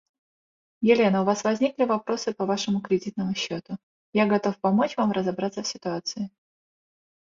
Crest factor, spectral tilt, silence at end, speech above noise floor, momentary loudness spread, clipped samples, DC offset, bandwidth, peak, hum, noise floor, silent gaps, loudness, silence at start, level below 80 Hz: 20 dB; -5.5 dB/octave; 1 s; over 66 dB; 10 LU; under 0.1%; under 0.1%; 7.6 kHz; -6 dBFS; none; under -90 dBFS; 3.83-4.13 s; -25 LUFS; 0.8 s; -68 dBFS